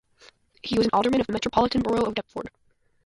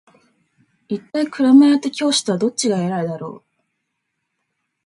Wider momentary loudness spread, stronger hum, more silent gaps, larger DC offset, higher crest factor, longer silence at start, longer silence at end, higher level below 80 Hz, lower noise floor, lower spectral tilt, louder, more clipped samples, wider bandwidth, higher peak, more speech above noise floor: about the same, 16 LU vs 17 LU; neither; neither; neither; about the same, 20 dB vs 18 dB; second, 0.65 s vs 0.9 s; second, 0.6 s vs 1.5 s; first, -50 dBFS vs -68 dBFS; second, -56 dBFS vs -75 dBFS; about the same, -5.5 dB/octave vs -4.5 dB/octave; second, -24 LUFS vs -17 LUFS; neither; about the same, 11.5 kHz vs 11.5 kHz; second, -6 dBFS vs -2 dBFS; second, 33 dB vs 58 dB